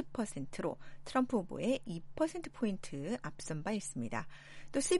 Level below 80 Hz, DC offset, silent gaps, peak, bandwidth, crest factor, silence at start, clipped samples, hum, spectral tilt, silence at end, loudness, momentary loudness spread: -58 dBFS; under 0.1%; none; -20 dBFS; 11.5 kHz; 18 dB; 0 s; under 0.1%; none; -5 dB/octave; 0 s; -38 LUFS; 7 LU